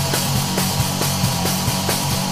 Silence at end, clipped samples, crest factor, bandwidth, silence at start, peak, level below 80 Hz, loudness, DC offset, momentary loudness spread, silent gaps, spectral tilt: 0 s; under 0.1%; 14 dB; 15.5 kHz; 0 s; -4 dBFS; -40 dBFS; -19 LUFS; 0.9%; 1 LU; none; -3.5 dB/octave